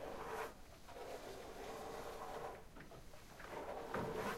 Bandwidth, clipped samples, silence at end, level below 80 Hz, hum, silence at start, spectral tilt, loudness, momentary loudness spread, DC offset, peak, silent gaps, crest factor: 16 kHz; under 0.1%; 0 s; -62 dBFS; none; 0 s; -4.5 dB/octave; -50 LUFS; 13 LU; under 0.1%; -30 dBFS; none; 18 dB